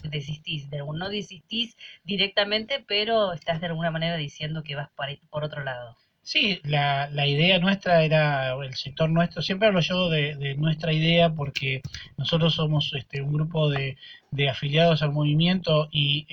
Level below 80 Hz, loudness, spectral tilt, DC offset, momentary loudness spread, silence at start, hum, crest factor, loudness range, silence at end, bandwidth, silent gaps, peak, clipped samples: -54 dBFS; -24 LUFS; -6.5 dB/octave; under 0.1%; 12 LU; 0 s; none; 18 dB; 5 LU; 0.1 s; 6.8 kHz; none; -8 dBFS; under 0.1%